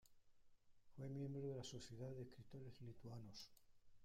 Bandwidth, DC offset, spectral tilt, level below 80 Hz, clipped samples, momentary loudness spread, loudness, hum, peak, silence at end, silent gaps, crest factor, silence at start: 15.5 kHz; under 0.1%; -6 dB/octave; -76 dBFS; under 0.1%; 10 LU; -55 LUFS; none; -40 dBFS; 0 s; none; 14 dB; 0.05 s